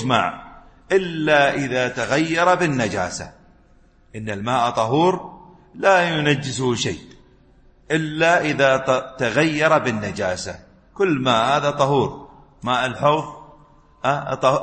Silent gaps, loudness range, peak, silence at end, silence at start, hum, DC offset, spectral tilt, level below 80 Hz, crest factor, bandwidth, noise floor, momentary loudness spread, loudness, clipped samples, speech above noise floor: none; 2 LU; -2 dBFS; 0 s; 0 s; none; under 0.1%; -5 dB/octave; -52 dBFS; 18 dB; 8.8 kHz; -53 dBFS; 13 LU; -20 LUFS; under 0.1%; 34 dB